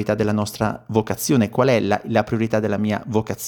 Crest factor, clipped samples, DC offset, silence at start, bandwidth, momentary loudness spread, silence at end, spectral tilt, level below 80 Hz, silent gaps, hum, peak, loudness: 18 dB; under 0.1%; under 0.1%; 0 s; over 20 kHz; 6 LU; 0 s; -6 dB/octave; -52 dBFS; none; none; -2 dBFS; -21 LUFS